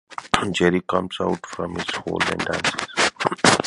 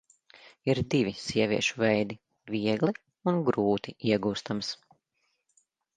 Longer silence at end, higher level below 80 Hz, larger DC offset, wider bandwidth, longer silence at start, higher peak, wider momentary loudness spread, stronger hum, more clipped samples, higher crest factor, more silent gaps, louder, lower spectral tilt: second, 0 s vs 1.2 s; first, -48 dBFS vs -60 dBFS; neither; first, 11.5 kHz vs 9.8 kHz; second, 0.1 s vs 0.45 s; first, 0 dBFS vs -10 dBFS; about the same, 8 LU vs 9 LU; neither; neither; about the same, 22 dB vs 20 dB; neither; first, -22 LUFS vs -29 LUFS; second, -3.5 dB/octave vs -5.5 dB/octave